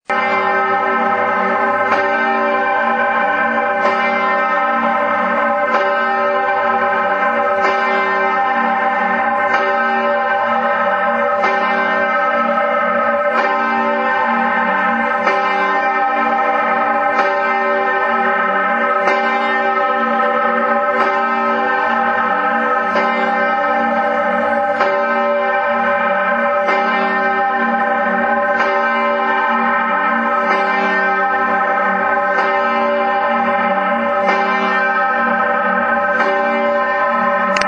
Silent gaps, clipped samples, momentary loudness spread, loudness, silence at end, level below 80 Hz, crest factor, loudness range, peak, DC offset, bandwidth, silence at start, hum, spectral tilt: none; under 0.1%; 1 LU; -15 LUFS; 0 s; -60 dBFS; 16 dB; 0 LU; 0 dBFS; under 0.1%; 8.8 kHz; 0.1 s; none; -5 dB/octave